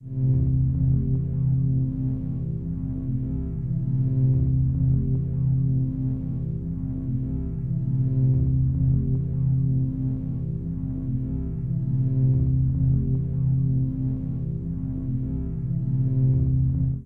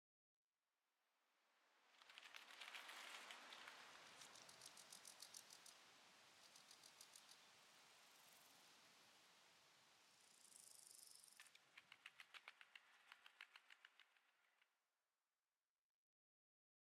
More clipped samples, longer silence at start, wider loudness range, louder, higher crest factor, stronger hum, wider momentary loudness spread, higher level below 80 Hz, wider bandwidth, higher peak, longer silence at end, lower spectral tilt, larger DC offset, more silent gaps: neither; second, 0 s vs 1 s; second, 2 LU vs 8 LU; first, -25 LUFS vs -63 LUFS; second, 12 dB vs 30 dB; neither; second, 8 LU vs 11 LU; first, -34 dBFS vs under -90 dBFS; second, 1.2 kHz vs 16 kHz; first, -12 dBFS vs -38 dBFS; second, 0 s vs 2.2 s; first, -14 dB/octave vs 1 dB/octave; neither; neither